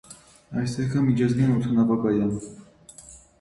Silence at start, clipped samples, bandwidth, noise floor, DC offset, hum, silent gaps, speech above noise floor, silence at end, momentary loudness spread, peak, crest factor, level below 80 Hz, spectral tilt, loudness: 0.1 s; under 0.1%; 11.5 kHz; -48 dBFS; under 0.1%; none; none; 26 dB; 0.25 s; 18 LU; -10 dBFS; 14 dB; -52 dBFS; -7.5 dB/octave; -23 LUFS